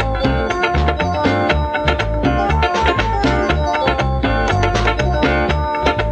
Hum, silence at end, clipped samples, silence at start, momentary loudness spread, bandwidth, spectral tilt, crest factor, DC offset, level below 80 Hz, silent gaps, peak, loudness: none; 0 s; under 0.1%; 0 s; 2 LU; 8.8 kHz; -6 dB/octave; 16 dB; under 0.1%; -22 dBFS; none; 0 dBFS; -16 LUFS